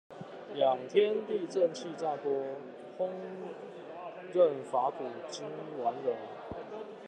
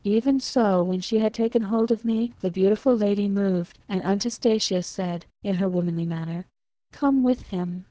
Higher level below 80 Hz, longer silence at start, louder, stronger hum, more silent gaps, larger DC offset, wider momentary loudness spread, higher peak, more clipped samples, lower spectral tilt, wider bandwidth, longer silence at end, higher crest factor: second, -74 dBFS vs -56 dBFS; about the same, 0.1 s vs 0.05 s; second, -33 LUFS vs -24 LUFS; neither; neither; neither; first, 16 LU vs 8 LU; second, -14 dBFS vs -10 dBFS; neither; about the same, -5.5 dB/octave vs -6 dB/octave; first, 9.4 kHz vs 8 kHz; about the same, 0 s vs 0.05 s; first, 20 dB vs 14 dB